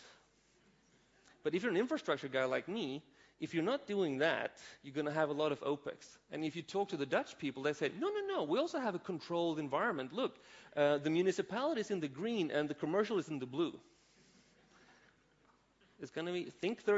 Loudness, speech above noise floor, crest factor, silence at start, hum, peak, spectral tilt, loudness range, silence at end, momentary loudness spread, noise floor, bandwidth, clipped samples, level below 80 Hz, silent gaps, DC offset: -37 LUFS; 34 dB; 20 dB; 0 s; none; -18 dBFS; -4 dB/octave; 5 LU; 0 s; 9 LU; -71 dBFS; 7.6 kHz; under 0.1%; -80 dBFS; none; under 0.1%